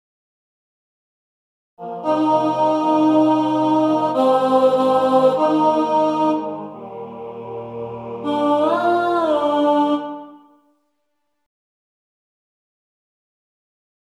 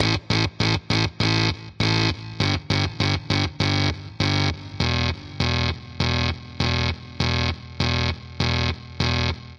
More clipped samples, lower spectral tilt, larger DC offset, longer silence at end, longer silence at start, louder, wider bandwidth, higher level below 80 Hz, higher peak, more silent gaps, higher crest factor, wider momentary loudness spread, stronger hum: neither; first, -7 dB/octave vs -5 dB/octave; neither; first, 3.65 s vs 0 s; first, 1.8 s vs 0 s; first, -17 LUFS vs -23 LUFS; about the same, 10 kHz vs 10.5 kHz; second, -68 dBFS vs -40 dBFS; about the same, -4 dBFS vs -4 dBFS; neither; about the same, 16 dB vs 18 dB; first, 17 LU vs 5 LU; neither